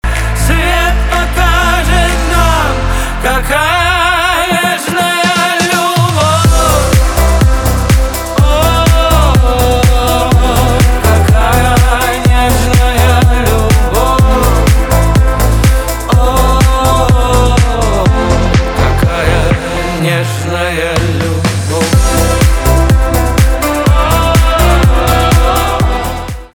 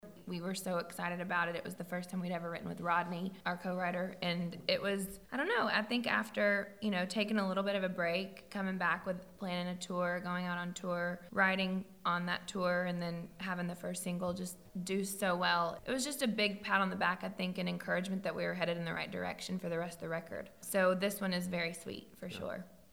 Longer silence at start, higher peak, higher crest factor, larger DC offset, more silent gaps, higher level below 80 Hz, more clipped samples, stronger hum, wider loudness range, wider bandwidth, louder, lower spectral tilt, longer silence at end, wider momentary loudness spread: about the same, 0.05 s vs 0.05 s; first, 0 dBFS vs -16 dBFS; second, 8 dB vs 20 dB; neither; neither; first, -12 dBFS vs -70 dBFS; neither; neither; about the same, 2 LU vs 4 LU; first, 19.5 kHz vs 17 kHz; first, -10 LUFS vs -36 LUFS; about the same, -5 dB/octave vs -4.5 dB/octave; about the same, 0.1 s vs 0.15 s; second, 4 LU vs 10 LU